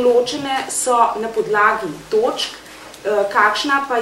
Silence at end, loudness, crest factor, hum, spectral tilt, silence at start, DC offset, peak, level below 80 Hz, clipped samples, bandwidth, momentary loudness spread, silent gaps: 0 s; -18 LUFS; 18 dB; none; -2 dB/octave; 0 s; under 0.1%; 0 dBFS; -56 dBFS; under 0.1%; 15.5 kHz; 9 LU; none